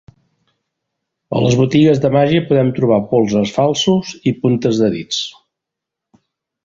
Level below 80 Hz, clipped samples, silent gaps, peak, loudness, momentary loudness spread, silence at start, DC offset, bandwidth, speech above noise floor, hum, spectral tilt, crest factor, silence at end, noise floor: -50 dBFS; under 0.1%; none; -2 dBFS; -15 LUFS; 9 LU; 1.3 s; under 0.1%; 7.8 kHz; 68 dB; none; -6 dB/octave; 14 dB; 1.35 s; -82 dBFS